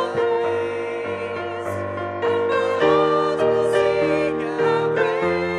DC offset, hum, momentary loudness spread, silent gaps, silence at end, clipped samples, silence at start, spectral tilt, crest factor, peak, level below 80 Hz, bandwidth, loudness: under 0.1%; none; 9 LU; none; 0 s; under 0.1%; 0 s; -6 dB/octave; 14 dB; -6 dBFS; -56 dBFS; 11 kHz; -21 LUFS